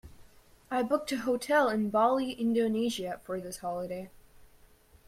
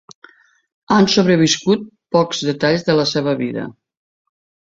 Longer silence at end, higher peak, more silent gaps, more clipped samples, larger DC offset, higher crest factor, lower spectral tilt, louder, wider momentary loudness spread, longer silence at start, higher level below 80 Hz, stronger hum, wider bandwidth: second, 0.65 s vs 0.95 s; second, -14 dBFS vs -2 dBFS; neither; neither; neither; about the same, 18 dB vs 16 dB; about the same, -5 dB/octave vs -5 dB/octave; second, -30 LUFS vs -16 LUFS; about the same, 11 LU vs 9 LU; second, 0.05 s vs 0.9 s; second, -62 dBFS vs -56 dBFS; neither; first, 16 kHz vs 7.8 kHz